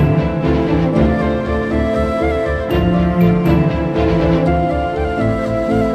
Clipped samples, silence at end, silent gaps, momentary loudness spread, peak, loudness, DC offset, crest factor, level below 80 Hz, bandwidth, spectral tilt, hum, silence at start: under 0.1%; 0 s; none; 4 LU; -2 dBFS; -16 LUFS; under 0.1%; 12 dB; -26 dBFS; 13 kHz; -8.5 dB/octave; none; 0 s